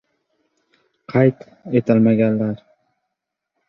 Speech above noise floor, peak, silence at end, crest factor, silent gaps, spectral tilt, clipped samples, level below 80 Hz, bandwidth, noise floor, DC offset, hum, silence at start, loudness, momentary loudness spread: 64 dB; -2 dBFS; 1.1 s; 18 dB; none; -10.5 dB/octave; under 0.1%; -60 dBFS; 5.6 kHz; -80 dBFS; under 0.1%; none; 1.1 s; -18 LUFS; 13 LU